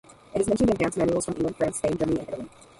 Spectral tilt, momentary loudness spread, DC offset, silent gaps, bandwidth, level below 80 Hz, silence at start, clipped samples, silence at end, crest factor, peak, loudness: -6 dB/octave; 10 LU; under 0.1%; none; 11.5 kHz; -48 dBFS; 0.35 s; under 0.1%; 0.3 s; 16 dB; -10 dBFS; -26 LUFS